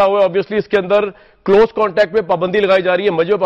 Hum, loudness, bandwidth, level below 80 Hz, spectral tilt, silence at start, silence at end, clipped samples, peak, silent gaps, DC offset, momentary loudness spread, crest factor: none; -14 LUFS; 7.2 kHz; -46 dBFS; -7 dB/octave; 0 s; 0 s; under 0.1%; -4 dBFS; none; under 0.1%; 4 LU; 10 dB